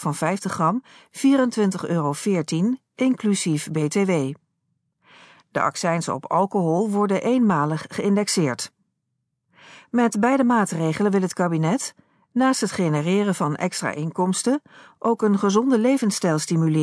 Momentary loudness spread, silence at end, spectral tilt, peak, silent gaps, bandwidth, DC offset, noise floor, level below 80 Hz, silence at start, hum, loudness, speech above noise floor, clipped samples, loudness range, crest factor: 7 LU; 0 s; -5.5 dB/octave; -6 dBFS; none; 11 kHz; under 0.1%; -77 dBFS; -70 dBFS; 0 s; none; -22 LUFS; 55 dB; under 0.1%; 3 LU; 16 dB